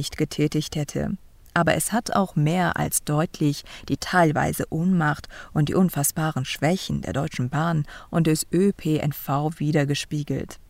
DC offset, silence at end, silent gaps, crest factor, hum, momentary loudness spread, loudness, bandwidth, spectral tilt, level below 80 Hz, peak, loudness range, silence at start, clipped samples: under 0.1%; 0.15 s; none; 18 dB; none; 7 LU; -24 LUFS; 16 kHz; -5.5 dB/octave; -48 dBFS; -6 dBFS; 1 LU; 0 s; under 0.1%